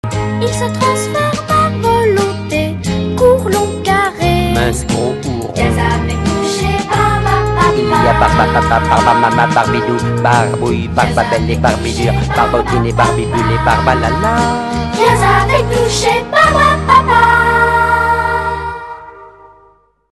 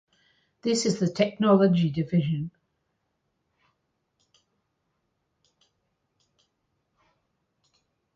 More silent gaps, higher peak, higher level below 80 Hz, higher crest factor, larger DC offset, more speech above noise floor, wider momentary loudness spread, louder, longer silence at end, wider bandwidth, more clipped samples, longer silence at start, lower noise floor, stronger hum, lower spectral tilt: neither; first, 0 dBFS vs -8 dBFS; first, -26 dBFS vs -66 dBFS; second, 12 dB vs 22 dB; neither; second, 37 dB vs 54 dB; second, 7 LU vs 12 LU; first, -12 LUFS vs -24 LUFS; second, 0.85 s vs 5.65 s; first, 13 kHz vs 9.4 kHz; first, 0.1% vs under 0.1%; second, 0.05 s vs 0.65 s; second, -49 dBFS vs -77 dBFS; neither; about the same, -5.5 dB/octave vs -6 dB/octave